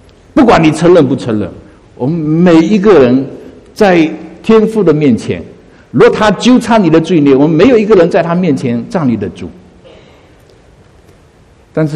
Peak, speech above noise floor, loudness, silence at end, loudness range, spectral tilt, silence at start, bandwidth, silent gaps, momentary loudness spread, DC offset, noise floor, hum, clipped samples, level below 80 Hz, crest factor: 0 dBFS; 35 dB; -9 LUFS; 0 s; 7 LU; -7 dB/octave; 0.35 s; 11.5 kHz; none; 12 LU; under 0.1%; -43 dBFS; none; 1%; -38 dBFS; 10 dB